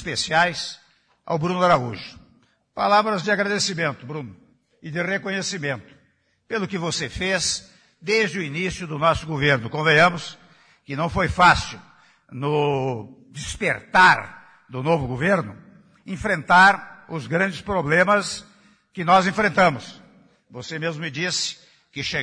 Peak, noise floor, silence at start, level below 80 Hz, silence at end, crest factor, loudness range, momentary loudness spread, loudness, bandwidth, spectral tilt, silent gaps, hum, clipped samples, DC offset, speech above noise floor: -4 dBFS; -64 dBFS; 0 s; -48 dBFS; 0 s; 18 dB; 6 LU; 19 LU; -21 LUFS; 10.5 kHz; -4 dB/octave; none; none; under 0.1%; under 0.1%; 43 dB